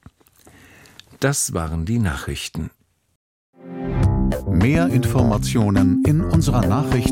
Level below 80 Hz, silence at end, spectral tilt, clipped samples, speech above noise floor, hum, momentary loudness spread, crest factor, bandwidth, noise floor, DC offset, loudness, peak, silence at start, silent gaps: -30 dBFS; 0 s; -6 dB/octave; under 0.1%; 33 dB; none; 10 LU; 18 dB; 16.5 kHz; -51 dBFS; under 0.1%; -19 LUFS; -2 dBFS; 1.2 s; 3.16-3.53 s